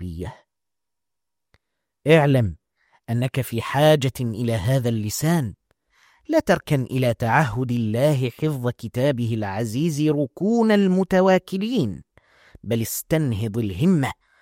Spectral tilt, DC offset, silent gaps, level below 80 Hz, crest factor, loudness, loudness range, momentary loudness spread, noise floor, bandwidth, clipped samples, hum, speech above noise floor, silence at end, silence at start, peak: -6.5 dB/octave; under 0.1%; none; -52 dBFS; 20 dB; -21 LUFS; 2 LU; 10 LU; -87 dBFS; 16.5 kHz; under 0.1%; none; 66 dB; 0.3 s; 0 s; -2 dBFS